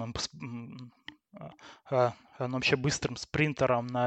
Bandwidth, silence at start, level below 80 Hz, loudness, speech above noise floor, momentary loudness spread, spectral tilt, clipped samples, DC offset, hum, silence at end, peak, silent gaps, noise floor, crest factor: 8.8 kHz; 0 s; -58 dBFS; -30 LUFS; 22 dB; 21 LU; -4.5 dB/octave; under 0.1%; under 0.1%; none; 0 s; -12 dBFS; none; -52 dBFS; 20 dB